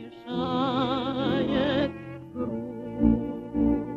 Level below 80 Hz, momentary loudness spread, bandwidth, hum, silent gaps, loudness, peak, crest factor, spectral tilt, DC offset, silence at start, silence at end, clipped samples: -42 dBFS; 10 LU; 7.4 kHz; none; none; -27 LUFS; -10 dBFS; 18 dB; -8 dB/octave; under 0.1%; 0 s; 0 s; under 0.1%